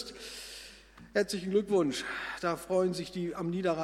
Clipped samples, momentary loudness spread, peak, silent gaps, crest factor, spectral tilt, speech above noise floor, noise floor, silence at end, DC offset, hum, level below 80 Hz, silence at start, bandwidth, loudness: under 0.1%; 14 LU; -14 dBFS; none; 18 dB; -5 dB/octave; 22 dB; -53 dBFS; 0 s; under 0.1%; none; -62 dBFS; 0 s; 15.5 kHz; -32 LUFS